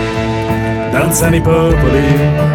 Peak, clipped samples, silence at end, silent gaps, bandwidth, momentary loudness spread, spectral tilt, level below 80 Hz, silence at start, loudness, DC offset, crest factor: 0 dBFS; under 0.1%; 0 s; none; 17.5 kHz; 5 LU; -6 dB/octave; -22 dBFS; 0 s; -12 LUFS; under 0.1%; 12 dB